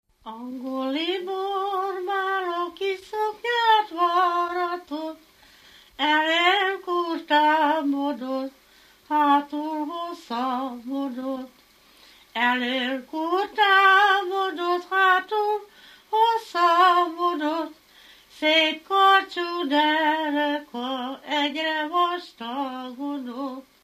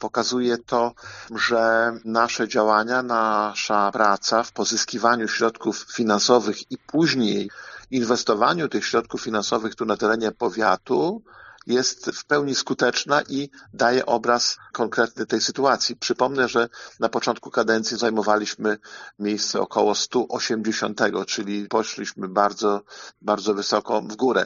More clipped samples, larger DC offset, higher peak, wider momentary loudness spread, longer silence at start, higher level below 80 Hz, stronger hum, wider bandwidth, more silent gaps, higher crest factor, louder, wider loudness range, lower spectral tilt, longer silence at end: neither; neither; second, -6 dBFS vs -2 dBFS; first, 13 LU vs 8 LU; first, 0.25 s vs 0 s; second, -72 dBFS vs -64 dBFS; neither; first, 15 kHz vs 7.4 kHz; neither; about the same, 18 dB vs 20 dB; about the same, -23 LUFS vs -22 LUFS; first, 7 LU vs 3 LU; about the same, -2 dB/octave vs -2 dB/octave; first, 0.25 s vs 0 s